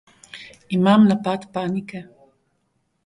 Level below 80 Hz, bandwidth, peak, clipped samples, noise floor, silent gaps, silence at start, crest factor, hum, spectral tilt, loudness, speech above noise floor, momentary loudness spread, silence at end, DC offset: -62 dBFS; 10.5 kHz; -4 dBFS; under 0.1%; -70 dBFS; none; 0.35 s; 18 dB; none; -7.5 dB/octave; -19 LUFS; 51 dB; 25 LU; 1.05 s; under 0.1%